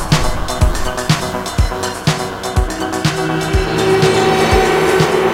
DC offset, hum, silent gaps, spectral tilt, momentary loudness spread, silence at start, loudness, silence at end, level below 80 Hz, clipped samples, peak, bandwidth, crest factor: under 0.1%; none; none; -5 dB/octave; 7 LU; 0 s; -15 LUFS; 0 s; -22 dBFS; under 0.1%; 0 dBFS; 16.5 kHz; 14 dB